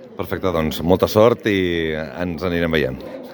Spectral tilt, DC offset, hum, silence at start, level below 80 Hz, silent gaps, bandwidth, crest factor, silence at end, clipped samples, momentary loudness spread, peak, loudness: -6 dB/octave; under 0.1%; none; 0 s; -40 dBFS; none; over 20 kHz; 18 dB; 0 s; under 0.1%; 11 LU; 0 dBFS; -19 LUFS